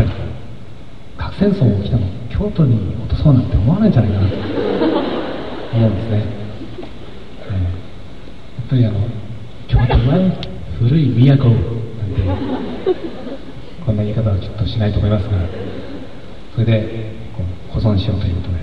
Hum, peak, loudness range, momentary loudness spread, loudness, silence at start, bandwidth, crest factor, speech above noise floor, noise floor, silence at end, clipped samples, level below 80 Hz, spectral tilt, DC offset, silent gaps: none; 0 dBFS; 7 LU; 19 LU; -17 LUFS; 0 s; 5.6 kHz; 18 dB; 21 dB; -36 dBFS; 0 s; under 0.1%; -30 dBFS; -9.5 dB/octave; 4%; none